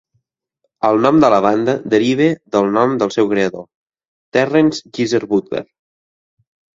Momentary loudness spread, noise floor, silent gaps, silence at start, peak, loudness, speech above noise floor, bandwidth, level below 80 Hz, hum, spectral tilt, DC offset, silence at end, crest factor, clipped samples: 9 LU; -71 dBFS; 3.75-3.87 s, 4.08-4.32 s; 0.85 s; 0 dBFS; -15 LUFS; 56 dB; 7.6 kHz; -56 dBFS; none; -6 dB/octave; under 0.1%; 1.1 s; 16 dB; under 0.1%